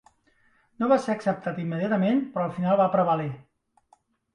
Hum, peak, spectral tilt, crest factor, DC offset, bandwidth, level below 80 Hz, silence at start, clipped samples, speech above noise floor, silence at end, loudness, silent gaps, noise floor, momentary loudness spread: none; -8 dBFS; -8 dB/octave; 18 dB; under 0.1%; 10.5 kHz; -68 dBFS; 0.8 s; under 0.1%; 40 dB; 0.95 s; -25 LUFS; none; -64 dBFS; 8 LU